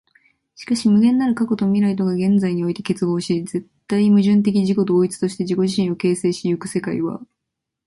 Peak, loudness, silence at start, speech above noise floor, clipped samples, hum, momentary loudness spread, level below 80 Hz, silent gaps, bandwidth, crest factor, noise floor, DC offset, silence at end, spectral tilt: -6 dBFS; -19 LUFS; 0.6 s; 63 dB; under 0.1%; none; 9 LU; -60 dBFS; none; 11.5 kHz; 12 dB; -81 dBFS; under 0.1%; 0.6 s; -7 dB/octave